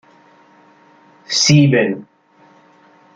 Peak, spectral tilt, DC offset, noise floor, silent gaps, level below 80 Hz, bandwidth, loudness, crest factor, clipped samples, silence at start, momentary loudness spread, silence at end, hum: -2 dBFS; -4.5 dB/octave; under 0.1%; -50 dBFS; none; -58 dBFS; 9 kHz; -13 LUFS; 18 dB; under 0.1%; 1.3 s; 11 LU; 1.1 s; none